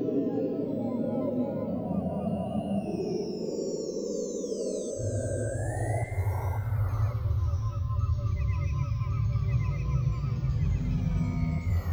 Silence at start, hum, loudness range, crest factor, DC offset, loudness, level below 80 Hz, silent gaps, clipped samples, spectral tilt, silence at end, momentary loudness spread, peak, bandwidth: 0 s; none; 3 LU; 12 dB; under 0.1%; -31 LUFS; -38 dBFS; none; under 0.1%; -8 dB/octave; 0 s; 4 LU; -16 dBFS; 13 kHz